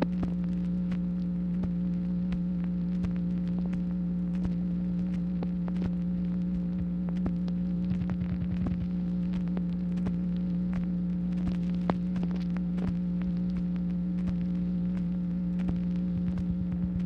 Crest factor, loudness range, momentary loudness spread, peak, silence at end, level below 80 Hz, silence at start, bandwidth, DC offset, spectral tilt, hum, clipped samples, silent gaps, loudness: 20 dB; 0 LU; 1 LU; -10 dBFS; 0 s; -44 dBFS; 0 s; 5 kHz; under 0.1%; -10.5 dB/octave; none; under 0.1%; none; -31 LUFS